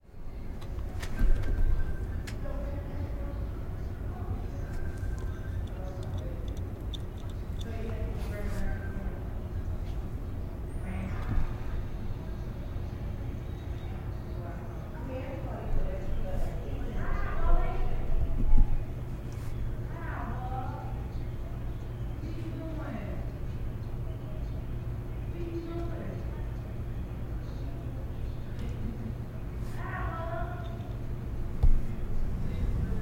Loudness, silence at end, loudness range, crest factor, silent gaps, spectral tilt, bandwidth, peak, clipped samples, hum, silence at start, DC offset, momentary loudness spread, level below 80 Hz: -37 LUFS; 0 s; 4 LU; 22 dB; none; -7.5 dB/octave; 7 kHz; -8 dBFS; under 0.1%; none; 0.05 s; under 0.1%; 6 LU; -32 dBFS